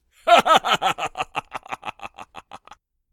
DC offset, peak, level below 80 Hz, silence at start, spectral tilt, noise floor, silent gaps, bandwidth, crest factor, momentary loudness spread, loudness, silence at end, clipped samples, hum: under 0.1%; -2 dBFS; -58 dBFS; 0.25 s; -2 dB/octave; -51 dBFS; none; 18 kHz; 22 dB; 24 LU; -19 LUFS; 0.55 s; under 0.1%; none